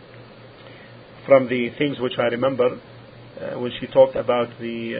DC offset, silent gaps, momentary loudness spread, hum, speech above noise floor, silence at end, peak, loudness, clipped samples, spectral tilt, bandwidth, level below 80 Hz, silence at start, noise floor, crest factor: under 0.1%; none; 19 LU; none; 23 dB; 0 s; 0 dBFS; -21 LUFS; under 0.1%; -10.5 dB/octave; 4.9 kHz; -58 dBFS; 0 s; -43 dBFS; 22 dB